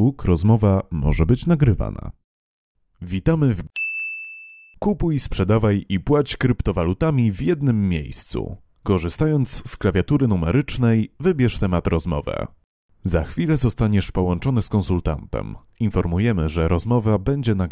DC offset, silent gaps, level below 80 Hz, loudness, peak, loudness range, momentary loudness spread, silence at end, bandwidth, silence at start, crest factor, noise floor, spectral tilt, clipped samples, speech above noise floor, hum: under 0.1%; 2.24-2.75 s, 12.64-12.89 s; -32 dBFS; -21 LUFS; -4 dBFS; 2 LU; 11 LU; 0 s; 4 kHz; 0 s; 16 dB; -43 dBFS; -12 dB/octave; under 0.1%; 23 dB; none